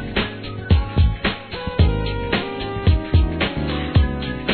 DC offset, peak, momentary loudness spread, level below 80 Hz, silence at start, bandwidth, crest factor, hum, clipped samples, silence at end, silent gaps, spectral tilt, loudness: 0.2%; -2 dBFS; 8 LU; -24 dBFS; 0 s; 4.5 kHz; 16 dB; none; under 0.1%; 0 s; none; -10 dB/octave; -21 LUFS